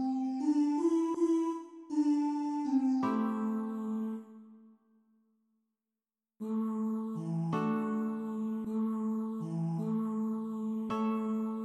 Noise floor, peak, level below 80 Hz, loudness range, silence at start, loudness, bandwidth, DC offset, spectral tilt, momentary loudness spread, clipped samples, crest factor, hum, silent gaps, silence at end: under -90 dBFS; -20 dBFS; -80 dBFS; 9 LU; 0 s; -33 LUFS; 9.8 kHz; under 0.1%; -8 dB/octave; 7 LU; under 0.1%; 14 dB; none; none; 0 s